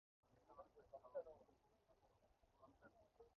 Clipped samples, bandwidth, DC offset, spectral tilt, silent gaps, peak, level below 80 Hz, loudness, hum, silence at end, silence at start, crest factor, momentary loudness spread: under 0.1%; 6.2 kHz; under 0.1%; -5.5 dB/octave; none; -42 dBFS; -84 dBFS; -60 LUFS; none; 0.05 s; 0.25 s; 22 dB; 11 LU